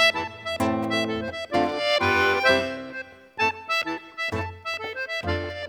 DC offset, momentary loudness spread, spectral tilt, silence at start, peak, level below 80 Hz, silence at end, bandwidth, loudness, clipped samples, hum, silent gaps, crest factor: under 0.1%; 11 LU; -4 dB/octave; 0 s; -6 dBFS; -52 dBFS; 0 s; over 20 kHz; -25 LUFS; under 0.1%; none; none; 20 dB